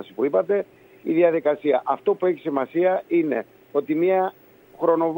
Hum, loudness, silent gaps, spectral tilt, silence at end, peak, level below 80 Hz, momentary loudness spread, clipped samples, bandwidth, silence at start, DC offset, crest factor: none; -22 LUFS; none; -9 dB/octave; 0 s; -6 dBFS; -74 dBFS; 8 LU; under 0.1%; 16 kHz; 0 s; under 0.1%; 16 dB